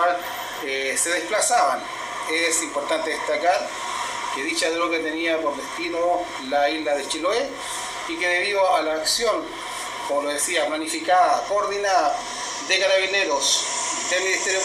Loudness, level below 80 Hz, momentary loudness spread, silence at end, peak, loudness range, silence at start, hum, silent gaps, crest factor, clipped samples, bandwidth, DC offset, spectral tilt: -22 LUFS; -60 dBFS; 9 LU; 0 s; -6 dBFS; 3 LU; 0 s; none; none; 16 dB; under 0.1%; 15 kHz; under 0.1%; -0.5 dB/octave